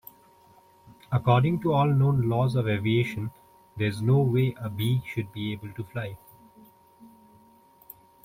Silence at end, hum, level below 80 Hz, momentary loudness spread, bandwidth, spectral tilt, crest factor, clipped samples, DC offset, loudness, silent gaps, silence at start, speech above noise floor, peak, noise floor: 1.15 s; none; -58 dBFS; 14 LU; 16 kHz; -8 dB/octave; 18 dB; under 0.1%; under 0.1%; -26 LUFS; none; 1.1 s; 32 dB; -8 dBFS; -57 dBFS